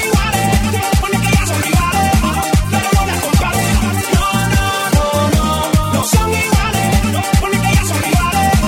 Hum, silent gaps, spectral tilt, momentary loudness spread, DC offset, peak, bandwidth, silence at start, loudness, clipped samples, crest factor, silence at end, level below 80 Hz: none; none; -4.5 dB/octave; 2 LU; under 0.1%; 0 dBFS; 19 kHz; 0 s; -14 LUFS; under 0.1%; 14 dB; 0 s; -20 dBFS